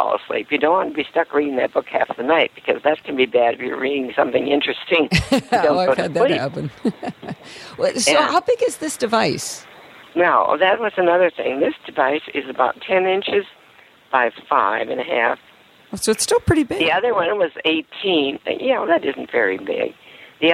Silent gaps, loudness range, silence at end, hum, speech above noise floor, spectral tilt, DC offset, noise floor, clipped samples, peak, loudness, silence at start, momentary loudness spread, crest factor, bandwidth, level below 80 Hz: none; 2 LU; 0 s; none; 31 dB; -4 dB/octave; under 0.1%; -49 dBFS; under 0.1%; -2 dBFS; -19 LUFS; 0 s; 8 LU; 18 dB; 15.5 kHz; -48 dBFS